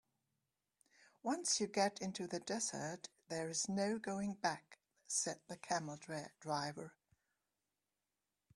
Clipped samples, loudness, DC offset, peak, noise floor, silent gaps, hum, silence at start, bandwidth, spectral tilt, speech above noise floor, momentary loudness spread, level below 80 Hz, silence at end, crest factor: under 0.1%; -41 LUFS; under 0.1%; -20 dBFS; under -90 dBFS; none; none; 1.25 s; 12.5 kHz; -3 dB/octave; over 48 dB; 11 LU; -82 dBFS; 1.65 s; 22 dB